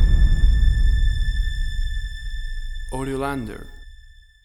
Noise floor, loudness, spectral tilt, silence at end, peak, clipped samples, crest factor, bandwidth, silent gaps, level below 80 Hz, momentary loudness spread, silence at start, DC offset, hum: -46 dBFS; -25 LUFS; -6 dB/octave; 0.5 s; -4 dBFS; under 0.1%; 14 dB; 11 kHz; none; -20 dBFS; 15 LU; 0 s; under 0.1%; none